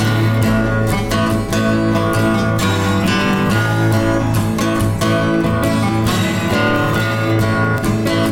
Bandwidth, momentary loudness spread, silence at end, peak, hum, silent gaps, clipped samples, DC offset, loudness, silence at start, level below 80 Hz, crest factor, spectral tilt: 17 kHz; 2 LU; 0 s; -4 dBFS; none; none; under 0.1%; under 0.1%; -16 LUFS; 0 s; -32 dBFS; 10 dB; -6 dB/octave